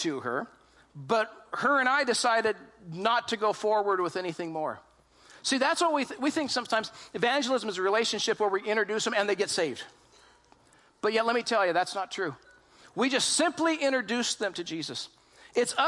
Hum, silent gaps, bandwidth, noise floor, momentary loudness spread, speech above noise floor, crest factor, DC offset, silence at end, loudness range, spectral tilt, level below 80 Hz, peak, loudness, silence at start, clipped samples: none; none; 11.5 kHz; -62 dBFS; 11 LU; 33 dB; 18 dB; under 0.1%; 0 s; 3 LU; -2.5 dB/octave; -74 dBFS; -10 dBFS; -28 LUFS; 0 s; under 0.1%